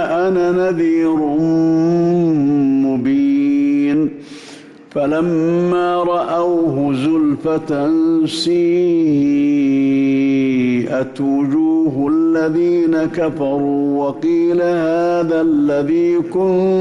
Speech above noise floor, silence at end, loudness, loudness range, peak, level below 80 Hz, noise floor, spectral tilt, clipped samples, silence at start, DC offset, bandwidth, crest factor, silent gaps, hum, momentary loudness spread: 23 dB; 0 s; -15 LUFS; 2 LU; -8 dBFS; -54 dBFS; -38 dBFS; -7.5 dB/octave; under 0.1%; 0 s; under 0.1%; 11 kHz; 6 dB; none; none; 4 LU